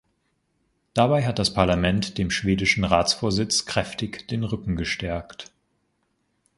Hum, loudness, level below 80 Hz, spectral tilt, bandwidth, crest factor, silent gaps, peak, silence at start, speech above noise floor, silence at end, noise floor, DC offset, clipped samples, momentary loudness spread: none; -23 LUFS; -42 dBFS; -4.5 dB/octave; 11.5 kHz; 22 dB; none; -4 dBFS; 0.95 s; 48 dB; 1.15 s; -72 dBFS; under 0.1%; under 0.1%; 10 LU